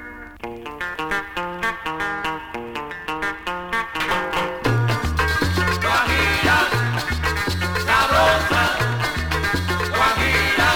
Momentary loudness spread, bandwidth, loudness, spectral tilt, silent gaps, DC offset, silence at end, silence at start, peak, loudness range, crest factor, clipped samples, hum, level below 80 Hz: 13 LU; 19 kHz; -20 LUFS; -4.5 dB/octave; none; under 0.1%; 0 s; 0 s; -4 dBFS; 8 LU; 16 dB; under 0.1%; none; -34 dBFS